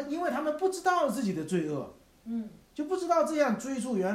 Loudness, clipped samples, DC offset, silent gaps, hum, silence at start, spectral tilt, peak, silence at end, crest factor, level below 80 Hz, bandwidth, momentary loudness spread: -30 LUFS; under 0.1%; under 0.1%; none; none; 0 s; -5.5 dB/octave; -14 dBFS; 0 s; 16 dB; -66 dBFS; 16 kHz; 11 LU